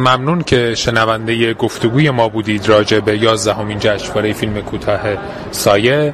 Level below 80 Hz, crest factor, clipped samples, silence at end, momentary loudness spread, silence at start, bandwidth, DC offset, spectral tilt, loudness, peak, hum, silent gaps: -38 dBFS; 14 dB; under 0.1%; 0 s; 7 LU; 0 s; 15.5 kHz; under 0.1%; -5 dB/octave; -14 LUFS; 0 dBFS; none; none